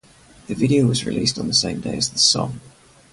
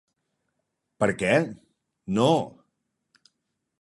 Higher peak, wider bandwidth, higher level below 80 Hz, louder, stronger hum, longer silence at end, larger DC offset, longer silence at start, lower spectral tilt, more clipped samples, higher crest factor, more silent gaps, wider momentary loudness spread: first, -2 dBFS vs -6 dBFS; about the same, 11.5 kHz vs 11.5 kHz; first, -50 dBFS vs -62 dBFS; first, -19 LUFS vs -24 LUFS; neither; second, 0.45 s vs 1.3 s; neither; second, 0.5 s vs 1 s; second, -4 dB/octave vs -6 dB/octave; neither; about the same, 18 dB vs 22 dB; neither; second, 12 LU vs 15 LU